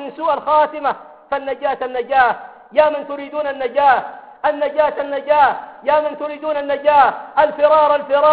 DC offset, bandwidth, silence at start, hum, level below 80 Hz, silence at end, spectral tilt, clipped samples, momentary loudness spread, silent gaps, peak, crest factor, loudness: under 0.1%; 4.8 kHz; 0 s; none; -56 dBFS; 0 s; -8 dB/octave; under 0.1%; 11 LU; none; -2 dBFS; 16 dB; -17 LUFS